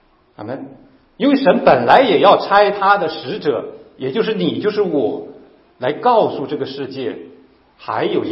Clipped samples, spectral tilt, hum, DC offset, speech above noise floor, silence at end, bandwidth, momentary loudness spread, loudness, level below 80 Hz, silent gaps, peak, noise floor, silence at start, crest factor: under 0.1%; -8 dB/octave; none; under 0.1%; 32 dB; 0 s; 5.8 kHz; 18 LU; -16 LUFS; -58 dBFS; none; 0 dBFS; -47 dBFS; 0.4 s; 16 dB